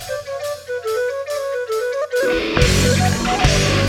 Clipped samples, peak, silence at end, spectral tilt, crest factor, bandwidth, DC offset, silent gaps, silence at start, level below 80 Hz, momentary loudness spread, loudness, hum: under 0.1%; -2 dBFS; 0 s; -4.5 dB/octave; 16 dB; 17 kHz; under 0.1%; none; 0 s; -28 dBFS; 11 LU; -19 LUFS; none